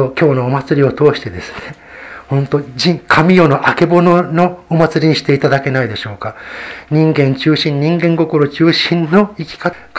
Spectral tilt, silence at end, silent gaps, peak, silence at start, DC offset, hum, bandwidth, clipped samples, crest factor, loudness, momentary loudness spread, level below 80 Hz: -7 dB/octave; 0 s; none; 0 dBFS; 0 s; under 0.1%; none; 8 kHz; 0.2%; 12 dB; -12 LUFS; 16 LU; -46 dBFS